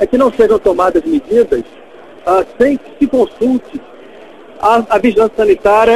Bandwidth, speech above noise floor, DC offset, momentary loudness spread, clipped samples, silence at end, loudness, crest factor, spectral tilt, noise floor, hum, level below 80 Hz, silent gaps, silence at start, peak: 13 kHz; 25 dB; 0.6%; 9 LU; under 0.1%; 0 s; -12 LUFS; 12 dB; -6 dB/octave; -36 dBFS; none; -40 dBFS; none; 0 s; 0 dBFS